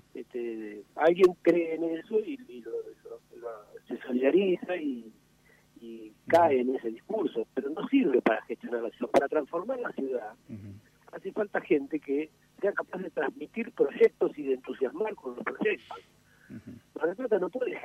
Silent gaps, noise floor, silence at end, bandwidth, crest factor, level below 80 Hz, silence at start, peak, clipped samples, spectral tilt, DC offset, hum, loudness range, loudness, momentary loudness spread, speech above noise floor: none; -63 dBFS; 0 s; 12.5 kHz; 22 dB; -72 dBFS; 0.15 s; -8 dBFS; under 0.1%; -6.5 dB/octave; under 0.1%; 60 Hz at -70 dBFS; 5 LU; -29 LUFS; 21 LU; 33 dB